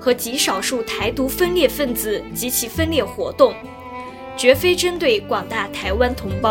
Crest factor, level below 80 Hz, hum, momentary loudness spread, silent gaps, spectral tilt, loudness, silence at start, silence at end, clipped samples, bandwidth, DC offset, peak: 20 dB; -38 dBFS; none; 9 LU; none; -3.5 dB/octave; -19 LUFS; 0 s; 0 s; under 0.1%; 17 kHz; under 0.1%; 0 dBFS